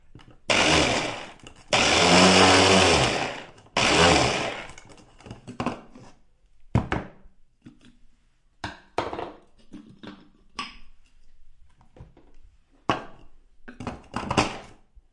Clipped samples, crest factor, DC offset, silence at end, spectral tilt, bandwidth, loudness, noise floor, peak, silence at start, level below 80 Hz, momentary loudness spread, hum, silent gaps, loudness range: under 0.1%; 22 dB; under 0.1%; 0.5 s; -3 dB/octave; 11.5 kHz; -21 LUFS; -60 dBFS; -4 dBFS; 0.15 s; -46 dBFS; 25 LU; none; none; 20 LU